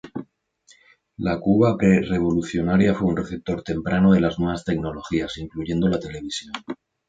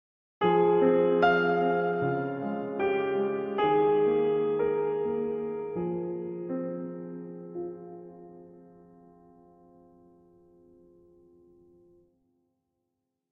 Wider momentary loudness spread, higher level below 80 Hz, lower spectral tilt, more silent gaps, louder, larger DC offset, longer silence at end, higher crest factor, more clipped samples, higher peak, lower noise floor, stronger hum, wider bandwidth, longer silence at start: second, 13 LU vs 18 LU; first, -44 dBFS vs -68 dBFS; second, -7 dB/octave vs -9 dB/octave; neither; first, -22 LUFS vs -27 LUFS; neither; second, 0.35 s vs 4.7 s; about the same, 18 dB vs 18 dB; neither; first, -4 dBFS vs -12 dBFS; second, -58 dBFS vs -83 dBFS; neither; first, 7.8 kHz vs 5.4 kHz; second, 0.05 s vs 0.4 s